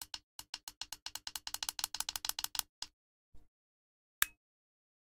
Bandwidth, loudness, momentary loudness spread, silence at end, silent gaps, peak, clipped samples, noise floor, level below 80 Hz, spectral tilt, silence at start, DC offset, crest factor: 18 kHz; -40 LUFS; 12 LU; 0.75 s; 0.23-0.39 s, 0.49-0.53 s, 0.63-0.67 s, 0.77-0.81 s, 1.02-1.06 s, 2.69-2.82 s, 2.93-3.32 s, 3.48-4.22 s; -8 dBFS; under 0.1%; under -90 dBFS; -68 dBFS; 2 dB/octave; 0 s; under 0.1%; 36 dB